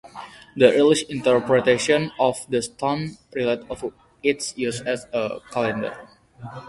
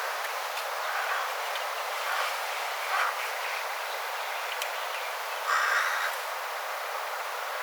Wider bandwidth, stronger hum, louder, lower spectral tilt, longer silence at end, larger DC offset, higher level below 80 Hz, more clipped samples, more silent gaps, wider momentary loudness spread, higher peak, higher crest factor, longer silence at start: second, 11.5 kHz vs over 20 kHz; neither; first, -22 LUFS vs -30 LUFS; first, -4.5 dB/octave vs 6 dB/octave; about the same, 0 s vs 0 s; neither; first, -58 dBFS vs under -90 dBFS; neither; neither; first, 16 LU vs 7 LU; first, -2 dBFS vs -14 dBFS; about the same, 20 dB vs 18 dB; about the same, 0.05 s vs 0 s